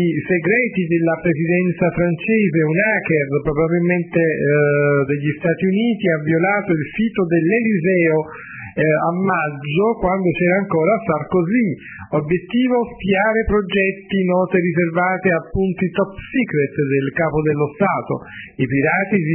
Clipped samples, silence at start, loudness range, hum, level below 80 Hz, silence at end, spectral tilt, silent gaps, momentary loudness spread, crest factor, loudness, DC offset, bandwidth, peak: under 0.1%; 0 s; 2 LU; none; -42 dBFS; 0 s; -11.5 dB/octave; none; 5 LU; 14 dB; -18 LUFS; under 0.1%; 3.3 kHz; -2 dBFS